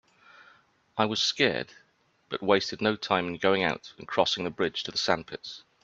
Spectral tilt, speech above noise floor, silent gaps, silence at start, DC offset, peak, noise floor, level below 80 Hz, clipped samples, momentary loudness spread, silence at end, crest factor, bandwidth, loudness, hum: -3.5 dB/octave; 33 dB; none; 0.95 s; under 0.1%; -6 dBFS; -61 dBFS; -66 dBFS; under 0.1%; 13 LU; 0.25 s; 24 dB; 8 kHz; -27 LUFS; none